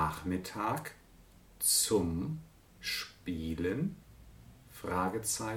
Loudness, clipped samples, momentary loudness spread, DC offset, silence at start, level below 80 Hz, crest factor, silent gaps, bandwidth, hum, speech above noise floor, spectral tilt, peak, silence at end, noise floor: -34 LUFS; under 0.1%; 17 LU; under 0.1%; 0 s; -54 dBFS; 20 dB; none; 19.5 kHz; none; 25 dB; -3.5 dB/octave; -16 dBFS; 0 s; -59 dBFS